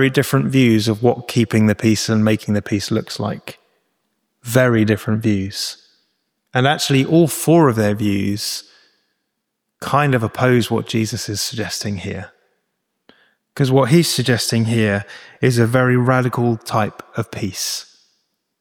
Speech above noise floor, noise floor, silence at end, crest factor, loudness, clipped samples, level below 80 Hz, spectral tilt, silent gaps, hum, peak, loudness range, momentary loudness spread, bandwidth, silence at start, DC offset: 59 dB; -75 dBFS; 0.75 s; 16 dB; -17 LUFS; under 0.1%; -54 dBFS; -5.5 dB/octave; none; none; -2 dBFS; 4 LU; 12 LU; 20 kHz; 0 s; under 0.1%